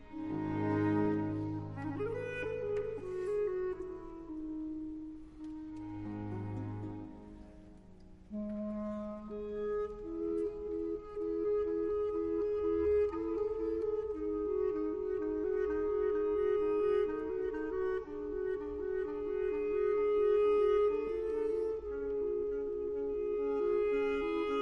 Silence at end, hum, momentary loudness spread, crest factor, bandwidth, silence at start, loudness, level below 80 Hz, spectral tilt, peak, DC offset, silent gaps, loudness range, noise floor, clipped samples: 0 s; none; 12 LU; 14 dB; 5.8 kHz; 0 s; -35 LUFS; -56 dBFS; -8.5 dB/octave; -20 dBFS; under 0.1%; none; 11 LU; -55 dBFS; under 0.1%